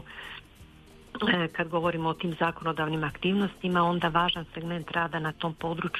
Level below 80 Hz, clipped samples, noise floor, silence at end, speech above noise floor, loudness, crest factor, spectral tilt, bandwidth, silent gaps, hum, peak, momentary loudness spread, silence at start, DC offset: -54 dBFS; under 0.1%; -52 dBFS; 0 s; 24 dB; -28 LUFS; 20 dB; -6.5 dB/octave; 13 kHz; none; none; -10 dBFS; 10 LU; 0 s; under 0.1%